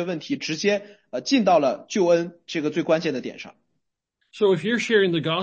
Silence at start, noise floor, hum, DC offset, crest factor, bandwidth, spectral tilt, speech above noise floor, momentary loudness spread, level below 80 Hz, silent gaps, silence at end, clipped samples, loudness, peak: 0 s; -77 dBFS; none; under 0.1%; 16 dB; 8.6 kHz; -5 dB/octave; 55 dB; 12 LU; -72 dBFS; none; 0 s; under 0.1%; -22 LUFS; -6 dBFS